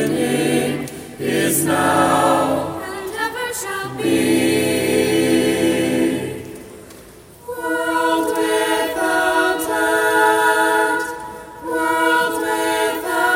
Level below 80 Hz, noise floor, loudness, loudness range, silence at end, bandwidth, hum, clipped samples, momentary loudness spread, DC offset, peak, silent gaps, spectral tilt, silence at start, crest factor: -52 dBFS; -42 dBFS; -18 LUFS; 3 LU; 0 s; 16.5 kHz; none; under 0.1%; 12 LU; under 0.1%; -4 dBFS; none; -4 dB/octave; 0 s; 16 dB